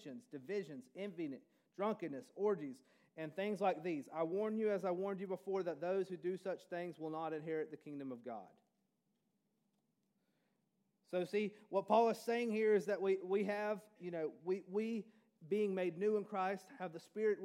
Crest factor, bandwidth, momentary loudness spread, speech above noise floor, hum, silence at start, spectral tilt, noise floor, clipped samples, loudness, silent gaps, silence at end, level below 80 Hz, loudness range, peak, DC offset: 22 dB; 14.5 kHz; 13 LU; 44 dB; none; 0 s; -6.5 dB/octave; -84 dBFS; under 0.1%; -40 LUFS; none; 0 s; under -90 dBFS; 11 LU; -20 dBFS; under 0.1%